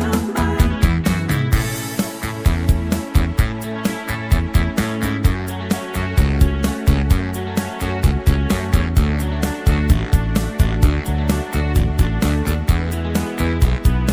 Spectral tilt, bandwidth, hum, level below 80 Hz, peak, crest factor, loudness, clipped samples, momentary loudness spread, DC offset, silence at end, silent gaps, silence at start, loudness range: -6 dB/octave; 17.5 kHz; none; -20 dBFS; -2 dBFS; 16 dB; -19 LUFS; under 0.1%; 6 LU; under 0.1%; 0 s; none; 0 s; 2 LU